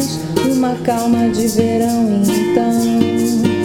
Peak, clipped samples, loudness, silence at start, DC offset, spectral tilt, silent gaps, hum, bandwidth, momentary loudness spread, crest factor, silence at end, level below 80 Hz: 0 dBFS; under 0.1%; -15 LUFS; 0 s; under 0.1%; -5.5 dB/octave; none; none; 17.5 kHz; 2 LU; 14 dB; 0 s; -46 dBFS